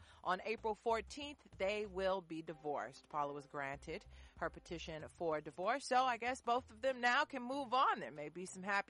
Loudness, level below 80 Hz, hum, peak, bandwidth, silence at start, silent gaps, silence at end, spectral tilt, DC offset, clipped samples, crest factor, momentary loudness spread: -40 LUFS; -66 dBFS; none; -24 dBFS; 11.5 kHz; 0 s; none; 0.1 s; -4 dB/octave; under 0.1%; under 0.1%; 18 dB; 13 LU